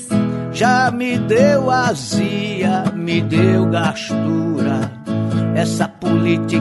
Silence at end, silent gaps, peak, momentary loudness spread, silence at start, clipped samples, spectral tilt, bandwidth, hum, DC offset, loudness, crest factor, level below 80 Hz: 0 s; none; 0 dBFS; 6 LU; 0 s; under 0.1%; -6 dB/octave; 11.5 kHz; none; under 0.1%; -17 LUFS; 16 dB; -52 dBFS